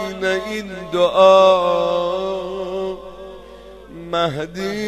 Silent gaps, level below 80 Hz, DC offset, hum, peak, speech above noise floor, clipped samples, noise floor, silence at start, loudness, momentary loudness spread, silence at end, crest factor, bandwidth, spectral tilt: none; -48 dBFS; under 0.1%; none; 0 dBFS; 23 dB; under 0.1%; -39 dBFS; 0 s; -18 LUFS; 24 LU; 0 s; 18 dB; 13 kHz; -5 dB/octave